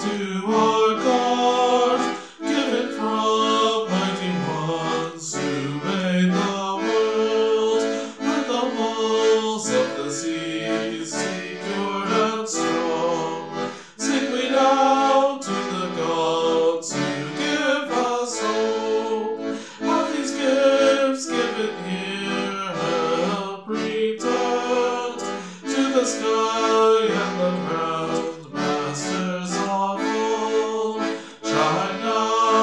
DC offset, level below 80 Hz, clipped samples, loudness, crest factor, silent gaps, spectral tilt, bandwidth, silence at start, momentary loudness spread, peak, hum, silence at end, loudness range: 0.1%; -72 dBFS; under 0.1%; -22 LUFS; 16 dB; none; -4 dB/octave; 11 kHz; 0 s; 8 LU; -6 dBFS; none; 0 s; 3 LU